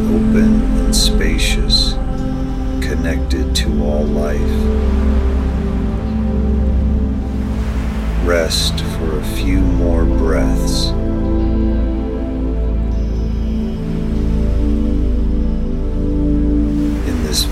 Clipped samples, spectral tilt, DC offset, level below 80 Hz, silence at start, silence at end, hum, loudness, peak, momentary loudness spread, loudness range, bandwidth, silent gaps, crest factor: under 0.1%; -5.5 dB/octave; under 0.1%; -18 dBFS; 0 s; 0 s; none; -17 LUFS; 0 dBFS; 7 LU; 3 LU; 15 kHz; none; 14 dB